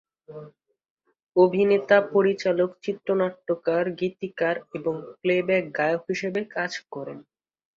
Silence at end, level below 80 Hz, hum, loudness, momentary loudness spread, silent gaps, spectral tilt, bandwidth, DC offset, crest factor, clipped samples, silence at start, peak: 0.55 s; -70 dBFS; none; -24 LUFS; 17 LU; 0.90-0.97 s, 1.23-1.27 s; -6.5 dB/octave; 7.4 kHz; under 0.1%; 22 dB; under 0.1%; 0.3 s; -4 dBFS